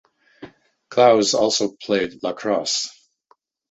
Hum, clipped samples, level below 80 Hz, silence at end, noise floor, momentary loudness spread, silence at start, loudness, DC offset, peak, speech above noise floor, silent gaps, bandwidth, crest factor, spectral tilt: none; under 0.1%; -62 dBFS; 0.8 s; -61 dBFS; 11 LU; 0.4 s; -20 LUFS; under 0.1%; -2 dBFS; 43 dB; none; 8.2 kHz; 20 dB; -3 dB/octave